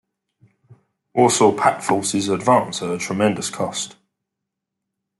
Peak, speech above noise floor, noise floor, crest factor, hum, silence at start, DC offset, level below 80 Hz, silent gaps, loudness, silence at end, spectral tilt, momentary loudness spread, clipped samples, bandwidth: -2 dBFS; 63 dB; -82 dBFS; 20 dB; none; 1.15 s; under 0.1%; -64 dBFS; none; -19 LUFS; 1.3 s; -4 dB/octave; 10 LU; under 0.1%; 12 kHz